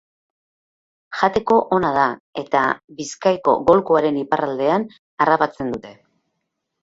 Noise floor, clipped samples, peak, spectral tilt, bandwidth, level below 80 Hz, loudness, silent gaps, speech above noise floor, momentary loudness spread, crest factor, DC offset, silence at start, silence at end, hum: -76 dBFS; under 0.1%; -2 dBFS; -5.5 dB/octave; 8 kHz; -54 dBFS; -19 LUFS; 2.20-2.33 s, 2.84-2.88 s, 4.99-5.17 s; 58 dB; 12 LU; 20 dB; under 0.1%; 1.1 s; 0.9 s; none